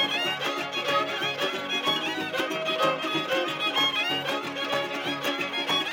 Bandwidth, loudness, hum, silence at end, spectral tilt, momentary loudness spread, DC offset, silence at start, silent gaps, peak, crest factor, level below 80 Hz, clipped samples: 17 kHz; -26 LUFS; none; 0 s; -2.5 dB/octave; 5 LU; under 0.1%; 0 s; none; -12 dBFS; 16 dB; -78 dBFS; under 0.1%